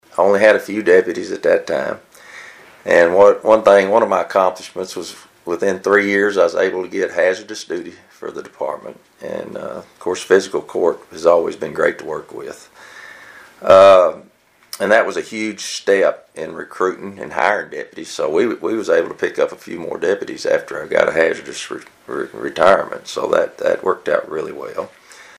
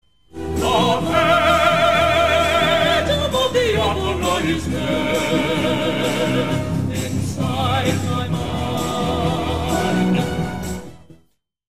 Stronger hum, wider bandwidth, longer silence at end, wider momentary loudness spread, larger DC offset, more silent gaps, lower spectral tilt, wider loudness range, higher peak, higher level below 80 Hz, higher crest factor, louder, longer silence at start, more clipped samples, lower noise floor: neither; about the same, 15 kHz vs 16 kHz; first, 0.15 s vs 0 s; first, 19 LU vs 8 LU; second, under 0.1% vs 1%; neither; about the same, -4 dB/octave vs -5 dB/octave; about the same, 6 LU vs 5 LU; about the same, 0 dBFS vs -2 dBFS; second, -58 dBFS vs -36 dBFS; about the same, 16 dB vs 16 dB; about the same, -16 LUFS vs -18 LUFS; first, 0.15 s vs 0 s; neither; second, -41 dBFS vs -60 dBFS